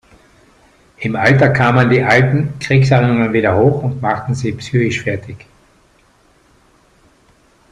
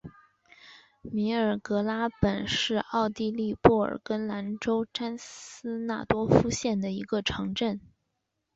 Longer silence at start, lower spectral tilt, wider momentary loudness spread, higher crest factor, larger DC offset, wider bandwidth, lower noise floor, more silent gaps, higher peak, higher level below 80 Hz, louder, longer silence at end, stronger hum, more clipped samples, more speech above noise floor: first, 1 s vs 0.05 s; first, -7 dB/octave vs -5.5 dB/octave; about the same, 10 LU vs 12 LU; second, 16 dB vs 26 dB; neither; first, 9.6 kHz vs 8 kHz; second, -52 dBFS vs -81 dBFS; neither; first, 0 dBFS vs -4 dBFS; about the same, -46 dBFS vs -50 dBFS; first, -14 LUFS vs -28 LUFS; first, 2.35 s vs 0.75 s; neither; neither; second, 39 dB vs 53 dB